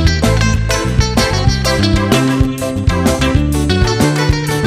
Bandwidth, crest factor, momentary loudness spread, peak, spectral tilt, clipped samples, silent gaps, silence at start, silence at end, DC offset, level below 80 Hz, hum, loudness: 16 kHz; 12 dB; 3 LU; 0 dBFS; -5 dB/octave; under 0.1%; none; 0 s; 0 s; under 0.1%; -20 dBFS; none; -13 LUFS